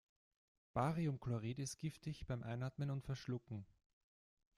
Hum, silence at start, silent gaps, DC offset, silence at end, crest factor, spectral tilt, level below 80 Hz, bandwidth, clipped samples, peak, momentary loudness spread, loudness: none; 0.75 s; none; under 0.1%; 0.95 s; 20 dB; -6.5 dB/octave; -66 dBFS; 13.5 kHz; under 0.1%; -26 dBFS; 7 LU; -45 LUFS